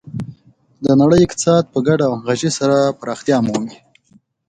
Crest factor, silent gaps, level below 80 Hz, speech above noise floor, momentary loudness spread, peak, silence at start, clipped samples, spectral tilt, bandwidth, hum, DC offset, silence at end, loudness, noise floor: 16 dB; none; -46 dBFS; 39 dB; 15 LU; 0 dBFS; 0.05 s; under 0.1%; -6 dB/octave; 9.4 kHz; none; under 0.1%; 0.75 s; -16 LUFS; -54 dBFS